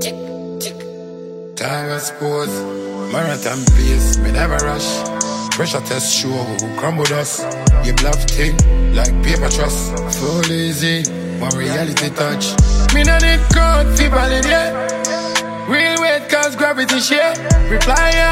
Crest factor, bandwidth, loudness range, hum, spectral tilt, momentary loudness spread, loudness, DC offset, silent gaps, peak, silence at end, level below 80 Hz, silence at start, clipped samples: 14 dB; 16 kHz; 4 LU; none; -4 dB/octave; 9 LU; -16 LUFS; under 0.1%; none; 0 dBFS; 0 s; -18 dBFS; 0 s; under 0.1%